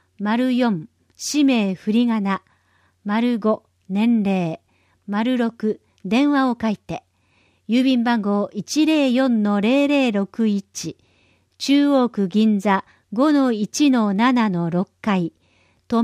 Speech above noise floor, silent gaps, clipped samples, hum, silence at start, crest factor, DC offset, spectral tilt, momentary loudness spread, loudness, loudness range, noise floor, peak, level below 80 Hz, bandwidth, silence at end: 43 dB; none; under 0.1%; none; 0.2 s; 14 dB; under 0.1%; -5.5 dB/octave; 11 LU; -20 LUFS; 4 LU; -62 dBFS; -6 dBFS; -64 dBFS; 14.5 kHz; 0 s